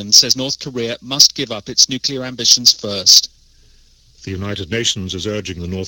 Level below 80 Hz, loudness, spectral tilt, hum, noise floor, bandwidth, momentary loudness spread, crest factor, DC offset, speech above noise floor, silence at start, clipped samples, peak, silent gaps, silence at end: -48 dBFS; -13 LUFS; -1.5 dB/octave; none; -49 dBFS; over 20 kHz; 16 LU; 16 dB; under 0.1%; 33 dB; 0 s; 0.1%; 0 dBFS; none; 0 s